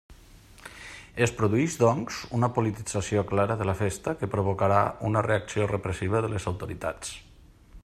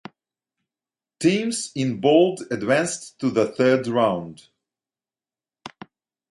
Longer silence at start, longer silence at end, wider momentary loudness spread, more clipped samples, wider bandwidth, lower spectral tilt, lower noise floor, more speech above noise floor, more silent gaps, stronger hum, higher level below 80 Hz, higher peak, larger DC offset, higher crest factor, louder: second, 0.1 s vs 1.2 s; second, 0.05 s vs 0.65 s; first, 15 LU vs 11 LU; neither; first, 14 kHz vs 11.5 kHz; about the same, -6 dB/octave vs -5 dB/octave; second, -51 dBFS vs under -90 dBFS; second, 25 dB vs over 69 dB; neither; neither; first, -52 dBFS vs -66 dBFS; second, -8 dBFS vs -4 dBFS; neither; about the same, 20 dB vs 20 dB; second, -27 LUFS vs -21 LUFS